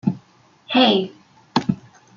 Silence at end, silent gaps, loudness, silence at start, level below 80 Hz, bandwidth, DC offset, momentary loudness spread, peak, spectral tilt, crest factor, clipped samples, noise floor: 0.4 s; none; -20 LUFS; 0.05 s; -60 dBFS; 7.2 kHz; under 0.1%; 17 LU; -2 dBFS; -6 dB/octave; 20 dB; under 0.1%; -54 dBFS